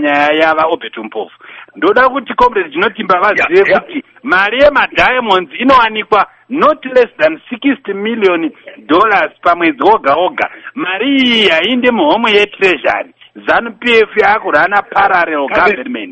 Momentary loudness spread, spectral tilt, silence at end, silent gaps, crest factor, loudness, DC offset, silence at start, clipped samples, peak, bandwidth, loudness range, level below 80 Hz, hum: 10 LU; -5 dB/octave; 0 s; none; 12 dB; -11 LUFS; under 0.1%; 0 s; 0.1%; 0 dBFS; 8.6 kHz; 2 LU; -44 dBFS; none